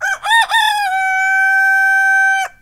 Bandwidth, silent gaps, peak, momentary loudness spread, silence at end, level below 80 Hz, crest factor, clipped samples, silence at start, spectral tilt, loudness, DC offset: 16 kHz; none; 0 dBFS; 4 LU; 0.15 s; -56 dBFS; 12 dB; under 0.1%; 0 s; 3 dB/octave; -12 LUFS; under 0.1%